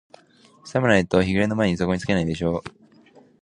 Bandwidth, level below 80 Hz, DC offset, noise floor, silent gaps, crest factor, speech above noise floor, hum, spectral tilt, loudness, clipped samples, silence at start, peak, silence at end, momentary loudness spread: 10 kHz; -44 dBFS; under 0.1%; -54 dBFS; none; 22 dB; 33 dB; none; -6.5 dB/octave; -22 LUFS; under 0.1%; 0.65 s; -2 dBFS; 0.75 s; 9 LU